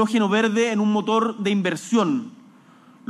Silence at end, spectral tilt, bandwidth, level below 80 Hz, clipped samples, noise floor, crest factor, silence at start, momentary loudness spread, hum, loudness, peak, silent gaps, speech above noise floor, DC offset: 0.8 s; -5.5 dB/octave; 12 kHz; -76 dBFS; under 0.1%; -51 dBFS; 14 dB; 0 s; 5 LU; none; -21 LUFS; -8 dBFS; none; 30 dB; under 0.1%